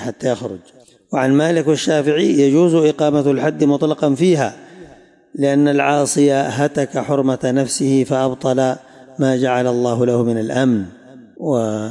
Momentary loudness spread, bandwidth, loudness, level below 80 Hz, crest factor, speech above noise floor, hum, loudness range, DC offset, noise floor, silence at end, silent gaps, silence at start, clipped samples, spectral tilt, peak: 8 LU; 11.5 kHz; -16 LUFS; -62 dBFS; 12 dB; 30 dB; none; 3 LU; under 0.1%; -45 dBFS; 0 s; none; 0 s; under 0.1%; -6 dB/octave; -4 dBFS